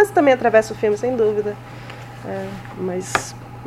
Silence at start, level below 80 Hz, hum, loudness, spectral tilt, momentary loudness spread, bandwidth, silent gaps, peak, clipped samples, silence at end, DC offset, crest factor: 0 s; -50 dBFS; none; -20 LUFS; -5 dB/octave; 19 LU; 15.5 kHz; none; 0 dBFS; under 0.1%; 0 s; under 0.1%; 20 dB